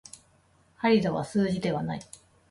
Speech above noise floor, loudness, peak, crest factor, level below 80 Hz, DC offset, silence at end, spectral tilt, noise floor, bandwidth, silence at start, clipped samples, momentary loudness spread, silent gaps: 37 dB; -27 LUFS; -10 dBFS; 18 dB; -60 dBFS; under 0.1%; 0.5 s; -6.5 dB/octave; -63 dBFS; 11.5 kHz; 0.8 s; under 0.1%; 18 LU; none